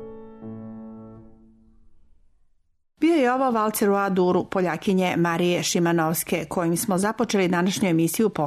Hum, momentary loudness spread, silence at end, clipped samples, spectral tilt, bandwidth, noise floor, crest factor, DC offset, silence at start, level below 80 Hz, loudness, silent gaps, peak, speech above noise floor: none; 18 LU; 0 s; under 0.1%; -5 dB/octave; 13.5 kHz; -64 dBFS; 12 dB; under 0.1%; 0 s; -58 dBFS; -22 LUFS; none; -12 dBFS; 43 dB